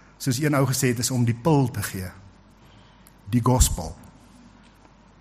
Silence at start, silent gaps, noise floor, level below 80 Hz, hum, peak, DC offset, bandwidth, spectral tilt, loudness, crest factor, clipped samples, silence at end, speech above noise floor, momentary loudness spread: 0.2 s; none; -52 dBFS; -34 dBFS; none; -4 dBFS; under 0.1%; 15.5 kHz; -5 dB/octave; -23 LUFS; 22 dB; under 0.1%; 1.15 s; 30 dB; 13 LU